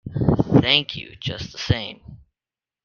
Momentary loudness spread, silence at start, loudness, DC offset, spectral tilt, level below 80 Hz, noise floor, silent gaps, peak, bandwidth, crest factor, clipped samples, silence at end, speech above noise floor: 14 LU; 0.05 s; -21 LUFS; under 0.1%; -6 dB/octave; -42 dBFS; under -90 dBFS; none; 0 dBFS; 7 kHz; 22 dB; under 0.1%; 0.7 s; over 66 dB